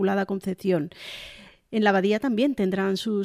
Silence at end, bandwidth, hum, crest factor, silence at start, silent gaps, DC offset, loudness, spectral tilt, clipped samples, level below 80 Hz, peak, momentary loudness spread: 0 s; 15 kHz; none; 16 dB; 0 s; none; under 0.1%; -25 LUFS; -6.5 dB/octave; under 0.1%; -60 dBFS; -10 dBFS; 16 LU